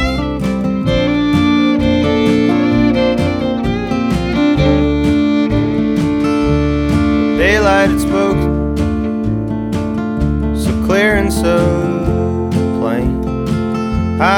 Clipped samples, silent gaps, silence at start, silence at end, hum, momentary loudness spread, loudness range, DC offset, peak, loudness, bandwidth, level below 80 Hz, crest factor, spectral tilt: under 0.1%; none; 0 s; 0 s; none; 6 LU; 2 LU; under 0.1%; 0 dBFS; -14 LUFS; 16.5 kHz; -24 dBFS; 12 dB; -6.5 dB/octave